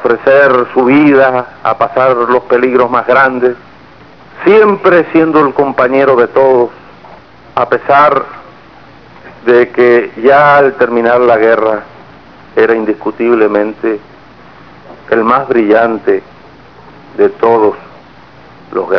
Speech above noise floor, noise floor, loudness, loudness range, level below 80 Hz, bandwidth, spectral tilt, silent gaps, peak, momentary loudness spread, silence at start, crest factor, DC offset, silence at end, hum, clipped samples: 29 dB; -37 dBFS; -9 LUFS; 5 LU; -50 dBFS; 5.4 kHz; -8 dB/octave; none; 0 dBFS; 9 LU; 0 s; 10 dB; 0.5%; 0 s; none; 1%